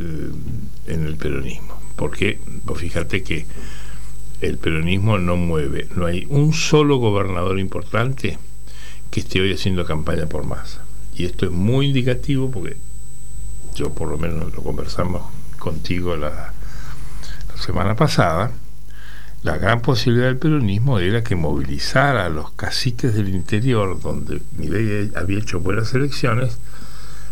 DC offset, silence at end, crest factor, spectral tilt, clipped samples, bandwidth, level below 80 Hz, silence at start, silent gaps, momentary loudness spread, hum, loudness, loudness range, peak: 10%; 0 s; 18 dB; -6 dB/octave; under 0.1%; 19 kHz; -34 dBFS; 0 s; none; 19 LU; none; -21 LUFS; 7 LU; -2 dBFS